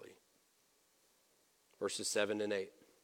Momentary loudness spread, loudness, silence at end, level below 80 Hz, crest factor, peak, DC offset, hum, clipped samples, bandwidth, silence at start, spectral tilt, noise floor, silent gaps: 8 LU; -38 LUFS; 0.35 s; -88 dBFS; 24 dB; -20 dBFS; under 0.1%; none; under 0.1%; 17.5 kHz; 0 s; -2.5 dB/octave; -74 dBFS; none